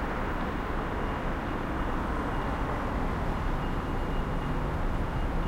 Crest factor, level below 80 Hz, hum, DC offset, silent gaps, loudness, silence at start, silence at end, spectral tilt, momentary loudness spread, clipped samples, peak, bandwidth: 12 dB; -34 dBFS; none; under 0.1%; none; -32 LUFS; 0 s; 0 s; -7 dB/octave; 1 LU; under 0.1%; -18 dBFS; 15.5 kHz